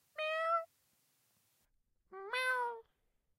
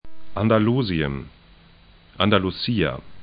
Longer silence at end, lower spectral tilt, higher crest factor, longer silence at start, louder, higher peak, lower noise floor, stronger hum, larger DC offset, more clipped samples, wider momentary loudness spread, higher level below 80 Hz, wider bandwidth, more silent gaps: first, 0.55 s vs 0 s; second, 0 dB/octave vs -11 dB/octave; about the same, 18 dB vs 20 dB; about the same, 0.15 s vs 0.05 s; second, -37 LUFS vs -22 LUFS; second, -24 dBFS vs -2 dBFS; first, -79 dBFS vs -51 dBFS; neither; neither; neither; first, 19 LU vs 9 LU; second, -86 dBFS vs -44 dBFS; first, 16 kHz vs 5.2 kHz; neither